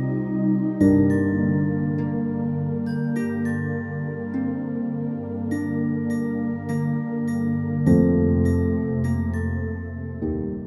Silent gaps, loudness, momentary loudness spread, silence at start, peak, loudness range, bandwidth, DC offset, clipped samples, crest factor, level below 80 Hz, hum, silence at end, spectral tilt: none; -23 LUFS; 10 LU; 0 s; -6 dBFS; 4 LU; 12 kHz; under 0.1%; under 0.1%; 18 dB; -42 dBFS; 50 Hz at -55 dBFS; 0 s; -10 dB/octave